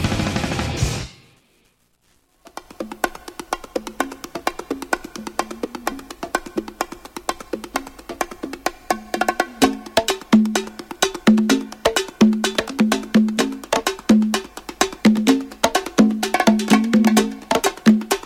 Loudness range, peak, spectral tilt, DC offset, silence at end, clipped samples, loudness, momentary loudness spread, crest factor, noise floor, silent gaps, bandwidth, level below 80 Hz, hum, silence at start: 11 LU; 0 dBFS; -4.5 dB/octave; under 0.1%; 0.05 s; under 0.1%; -20 LUFS; 13 LU; 20 dB; -61 dBFS; none; 17 kHz; -42 dBFS; none; 0 s